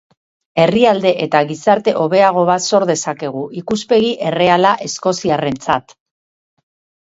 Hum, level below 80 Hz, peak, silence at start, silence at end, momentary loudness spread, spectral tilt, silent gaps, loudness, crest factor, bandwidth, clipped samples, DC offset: none; -56 dBFS; 0 dBFS; 0.55 s; 1.2 s; 9 LU; -4.5 dB/octave; none; -15 LUFS; 16 dB; 8 kHz; under 0.1%; under 0.1%